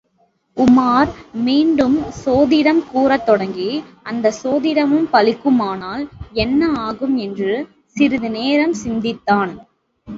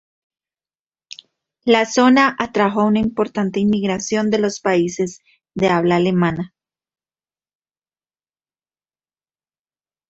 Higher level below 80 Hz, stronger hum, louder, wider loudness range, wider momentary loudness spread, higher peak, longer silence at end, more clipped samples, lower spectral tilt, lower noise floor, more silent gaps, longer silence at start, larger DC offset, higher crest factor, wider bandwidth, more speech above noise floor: first, -44 dBFS vs -54 dBFS; neither; about the same, -17 LUFS vs -17 LUFS; about the same, 4 LU vs 6 LU; about the same, 11 LU vs 11 LU; about the same, 0 dBFS vs -2 dBFS; second, 0 s vs 3.65 s; neither; about the same, -5.5 dB/octave vs -5.5 dB/octave; second, -61 dBFS vs under -90 dBFS; neither; second, 0.55 s vs 1.65 s; neither; about the same, 16 dB vs 18 dB; about the same, 7.6 kHz vs 8 kHz; second, 45 dB vs over 73 dB